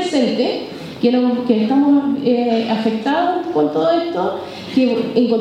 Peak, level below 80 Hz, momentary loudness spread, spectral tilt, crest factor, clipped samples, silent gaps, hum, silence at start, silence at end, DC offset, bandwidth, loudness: -2 dBFS; -60 dBFS; 7 LU; -6 dB/octave; 14 dB; under 0.1%; none; none; 0 s; 0 s; under 0.1%; 10 kHz; -17 LUFS